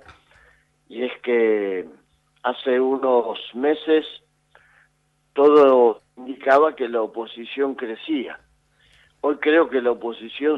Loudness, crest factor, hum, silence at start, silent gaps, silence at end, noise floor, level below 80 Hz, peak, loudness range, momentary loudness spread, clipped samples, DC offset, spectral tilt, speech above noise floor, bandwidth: -20 LUFS; 18 dB; none; 0.1 s; none; 0 s; -66 dBFS; -68 dBFS; -4 dBFS; 5 LU; 16 LU; under 0.1%; under 0.1%; -6 dB/octave; 46 dB; 5.6 kHz